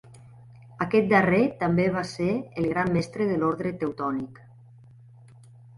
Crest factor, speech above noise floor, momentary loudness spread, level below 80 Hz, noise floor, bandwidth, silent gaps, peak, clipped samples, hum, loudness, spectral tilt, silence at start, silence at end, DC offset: 18 dB; 26 dB; 10 LU; -56 dBFS; -50 dBFS; 11.5 kHz; none; -8 dBFS; under 0.1%; none; -25 LUFS; -7.5 dB/octave; 0.15 s; 1.45 s; under 0.1%